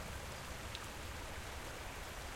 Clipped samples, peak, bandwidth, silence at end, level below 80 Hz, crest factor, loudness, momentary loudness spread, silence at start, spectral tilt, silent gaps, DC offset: under 0.1%; -26 dBFS; 16.5 kHz; 0 s; -52 dBFS; 22 dB; -47 LUFS; 1 LU; 0 s; -3.5 dB/octave; none; under 0.1%